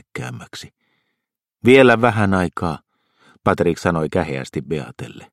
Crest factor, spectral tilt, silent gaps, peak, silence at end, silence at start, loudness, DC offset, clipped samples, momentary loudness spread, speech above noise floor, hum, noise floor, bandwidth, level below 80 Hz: 20 dB; -6.5 dB/octave; none; 0 dBFS; 0.1 s; 0.15 s; -17 LUFS; under 0.1%; under 0.1%; 22 LU; 62 dB; none; -80 dBFS; 13.5 kHz; -48 dBFS